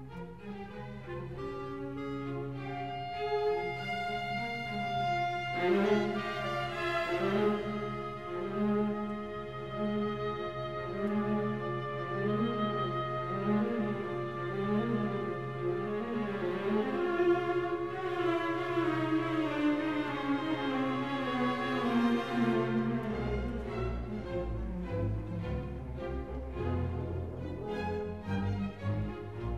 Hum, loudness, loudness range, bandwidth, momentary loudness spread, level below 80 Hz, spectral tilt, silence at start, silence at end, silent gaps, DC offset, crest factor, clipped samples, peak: none; -34 LUFS; 6 LU; 12.5 kHz; 9 LU; -50 dBFS; -7.5 dB/octave; 0 s; 0 s; none; 0.2%; 16 dB; under 0.1%; -18 dBFS